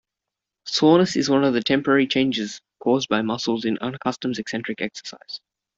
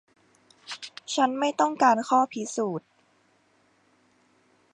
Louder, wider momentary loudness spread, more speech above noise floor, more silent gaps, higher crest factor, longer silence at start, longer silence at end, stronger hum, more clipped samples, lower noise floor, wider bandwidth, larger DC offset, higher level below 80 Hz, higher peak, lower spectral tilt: first, -22 LUFS vs -25 LUFS; about the same, 17 LU vs 17 LU; first, 64 dB vs 41 dB; neither; about the same, 18 dB vs 20 dB; about the same, 0.65 s vs 0.7 s; second, 0.4 s vs 1.95 s; neither; neither; first, -86 dBFS vs -65 dBFS; second, 7.8 kHz vs 10.5 kHz; neither; first, -62 dBFS vs -84 dBFS; first, -4 dBFS vs -8 dBFS; first, -5 dB/octave vs -3.5 dB/octave